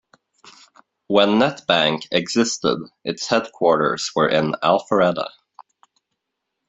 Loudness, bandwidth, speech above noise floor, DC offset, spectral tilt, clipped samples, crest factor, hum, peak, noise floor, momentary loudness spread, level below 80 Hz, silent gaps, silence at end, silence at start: -19 LUFS; 8.2 kHz; 60 dB; under 0.1%; -4 dB/octave; under 0.1%; 20 dB; none; -2 dBFS; -79 dBFS; 8 LU; -62 dBFS; none; 1.4 s; 1.1 s